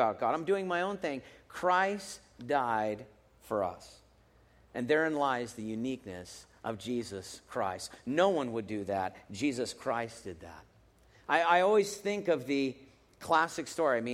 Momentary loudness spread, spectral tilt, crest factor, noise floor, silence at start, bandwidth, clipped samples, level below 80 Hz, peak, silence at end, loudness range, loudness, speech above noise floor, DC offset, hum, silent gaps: 17 LU; -4.5 dB/octave; 22 dB; -63 dBFS; 0 s; 16 kHz; under 0.1%; -68 dBFS; -10 dBFS; 0 s; 5 LU; -32 LUFS; 31 dB; under 0.1%; none; none